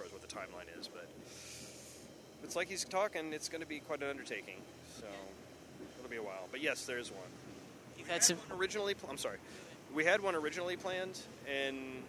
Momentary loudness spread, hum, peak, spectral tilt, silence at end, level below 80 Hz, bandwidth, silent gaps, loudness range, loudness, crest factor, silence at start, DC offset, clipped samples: 20 LU; none; -14 dBFS; -2 dB/octave; 0 s; -72 dBFS; over 20 kHz; none; 9 LU; -38 LUFS; 28 dB; 0 s; under 0.1%; under 0.1%